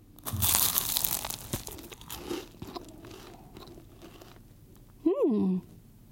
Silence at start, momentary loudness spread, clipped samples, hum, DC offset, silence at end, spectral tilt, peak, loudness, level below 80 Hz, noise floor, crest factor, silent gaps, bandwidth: 0.1 s; 25 LU; under 0.1%; none; under 0.1%; 0.25 s; -3.5 dB/octave; 0 dBFS; -28 LUFS; -54 dBFS; -53 dBFS; 32 dB; none; 17 kHz